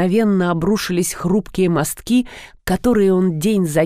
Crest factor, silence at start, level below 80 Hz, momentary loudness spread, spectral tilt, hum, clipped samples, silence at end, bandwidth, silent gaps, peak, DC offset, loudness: 14 dB; 0 s; -40 dBFS; 5 LU; -6 dB/octave; none; under 0.1%; 0 s; 16 kHz; none; -2 dBFS; 0.4%; -17 LUFS